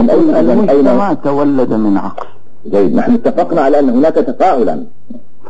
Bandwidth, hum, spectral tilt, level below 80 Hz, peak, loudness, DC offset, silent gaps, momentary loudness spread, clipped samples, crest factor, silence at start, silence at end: 8 kHz; none; -8.5 dB/octave; -50 dBFS; 0 dBFS; -11 LUFS; 10%; none; 10 LU; under 0.1%; 10 dB; 0 s; 0 s